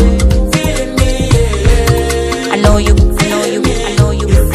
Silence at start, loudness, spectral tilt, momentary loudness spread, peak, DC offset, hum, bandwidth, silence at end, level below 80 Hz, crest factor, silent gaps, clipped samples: 0 s; -12 LUFS; -5.5 dB/octave; 4 LU; 0 dBFS; under 0.1%; none; 15 kHz; 0 s; -14 dBFS; 10 dB; none; 1%